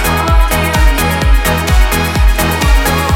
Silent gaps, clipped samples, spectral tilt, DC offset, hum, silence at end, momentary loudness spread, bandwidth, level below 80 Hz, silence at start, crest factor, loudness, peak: none; under 0.1%; -4.5 dB/octave; under 0.1%; none; 0 s; 1 LU; 17 kHz; -12 dBFS; 0 s; 10 dB; -12 LUFS; 0 dBFS